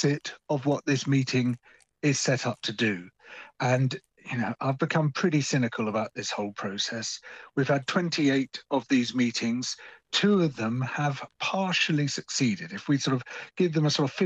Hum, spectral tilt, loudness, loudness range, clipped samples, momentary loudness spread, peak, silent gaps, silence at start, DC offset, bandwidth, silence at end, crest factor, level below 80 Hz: none; -5 dB/octave; -27 LUFS; 2 LU; under 0.1%; 9 LU; -10 dBFS; none; 0 s; under 0.1%; 8.8 kHz; 0 s; 16 dB; -72 dBFS